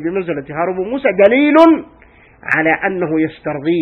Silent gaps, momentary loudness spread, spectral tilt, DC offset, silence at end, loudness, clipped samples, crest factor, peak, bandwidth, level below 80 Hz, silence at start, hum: none; 12 LU; -7.5 dB/octave; under 0.1%; 0 s; -14 LUFS; 0.2%; 14 dB; 0 dBFS; 6 kHz; -50 dBFS; 0 s; none